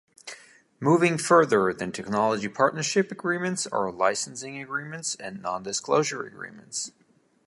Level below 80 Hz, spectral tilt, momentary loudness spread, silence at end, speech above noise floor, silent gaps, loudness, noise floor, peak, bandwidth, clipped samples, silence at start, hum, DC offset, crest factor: -68 dBFS; -4 dB/octave; 16 LU; 0.6 s; 23 dB; none; -25 LUFS; -49 dBFS; -4 dBFS; 11.5 kHz; under 0.1%; 0.25 s; none; under 0.1%; 22 dB